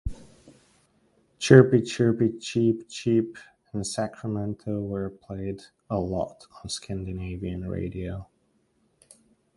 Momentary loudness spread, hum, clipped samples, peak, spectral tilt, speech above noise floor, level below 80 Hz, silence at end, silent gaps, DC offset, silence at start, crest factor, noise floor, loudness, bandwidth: 16 LU; none; under 0.1%; 0 dBFS; -6.5 dB/octave; 43 dB; -46 dBFS; 1.3 s; none; under 0.1%; 0.05 s; 26 dB; -68 dBFS; -26 LUFS; 11.5 kHz